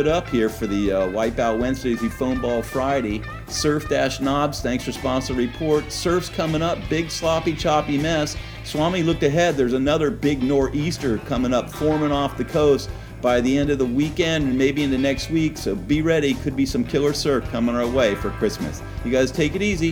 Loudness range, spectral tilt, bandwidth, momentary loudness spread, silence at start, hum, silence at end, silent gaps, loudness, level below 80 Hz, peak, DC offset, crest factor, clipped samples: 2 LU; -5.5 dB/octave; 19 kHz; 5 LU; 0 s; none; 0 s; none; -22 LUFS; -36 dBFS; -6 dBFS; under 0.1%; 16 dB; under 0.1%